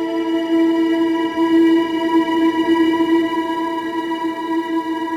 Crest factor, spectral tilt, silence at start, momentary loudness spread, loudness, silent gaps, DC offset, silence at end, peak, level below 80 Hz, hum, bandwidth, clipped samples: 12 dB; -5 dB/octave; 0 s; 7 LU; -17 LUFS; none; under 0.1%; 0 s; -6 dBFS; -58 dBFS; none; 9.2 kHz; under 0.1%